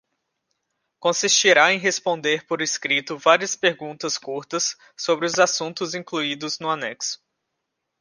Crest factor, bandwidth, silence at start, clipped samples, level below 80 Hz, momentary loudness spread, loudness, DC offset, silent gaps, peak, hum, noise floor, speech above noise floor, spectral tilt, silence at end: 22 dB; 11 kHz; 1 s; under 0.1%; -76 dBFS; 12 LU; -21 LUFS; under 0.1%; none; -2 dBFS; none; -79 dBFS; 57 dB; -1.5 dB/octave; 0.85 s